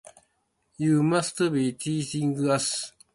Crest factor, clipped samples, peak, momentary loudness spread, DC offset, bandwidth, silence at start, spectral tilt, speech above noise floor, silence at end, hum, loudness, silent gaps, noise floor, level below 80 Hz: 16 dB; under 0.1%; -10 dBFS; 7 LU; under 0.1%; 11.5 kHz; 0.8 s; -5 dB/octave; 48 dB; 0.25 s; none; -26 LUFS; none; -73 dBFS; -66 dBFS